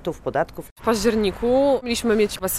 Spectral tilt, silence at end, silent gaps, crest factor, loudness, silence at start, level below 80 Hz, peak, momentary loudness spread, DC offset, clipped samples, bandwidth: -4 dB/octave; 0 s; 0.71-0.76 s; 14 dB; -21 LUFS; 0 s; -42 dBFS; -6 dBFS; 7 LU; under 0.1%; under 0.1%; 16 kHz